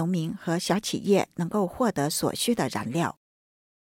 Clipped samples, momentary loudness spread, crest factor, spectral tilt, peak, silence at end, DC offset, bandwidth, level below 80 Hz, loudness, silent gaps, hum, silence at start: under 0.1%; 5 LU; 16 dB; -5 dB/octave; -10 dBFS; 0.85 s; under 0.1%; 17 kHz; -60 dBFS; -27 LUFS; none; none; 0 s